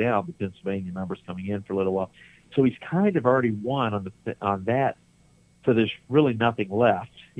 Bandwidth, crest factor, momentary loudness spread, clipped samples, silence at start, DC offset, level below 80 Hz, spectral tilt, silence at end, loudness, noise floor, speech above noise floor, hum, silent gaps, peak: 9.8 kHz; 18 dB; 10 LU; under 0.1%; 0 s; under 0.1%; -62 dBFS; -8.5 dB/octave; 0.2 s; -25 LUFS; -59 dBFS; 34 dB; none; none; -6 dBFS